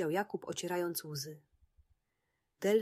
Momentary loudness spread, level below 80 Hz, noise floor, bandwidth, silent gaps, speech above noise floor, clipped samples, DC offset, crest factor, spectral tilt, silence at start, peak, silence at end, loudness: 10 LU; -76 dBFS; -84 dBFS; 15.5 kHz; none; 46 dB; under 0.1%; under 0.1%; 18 dB; -4.5 dB/octave; 0 s; -18 dBFS; 0 s; -37 LUFS